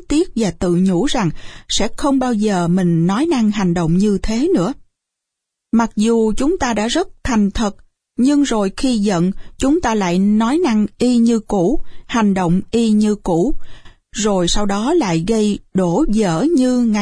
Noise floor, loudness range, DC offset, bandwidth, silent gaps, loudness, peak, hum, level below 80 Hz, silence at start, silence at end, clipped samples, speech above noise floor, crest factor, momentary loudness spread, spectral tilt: -80 dBFS; 2 LU; under 0.1%; 10.5 kHz; none; -16 LUFS; -4 dBFS; none; -32 dBFS; 0 s; 0 s; under 0.1%; 65 dB; 12 dB; 5 LU; -5.5 dB/octave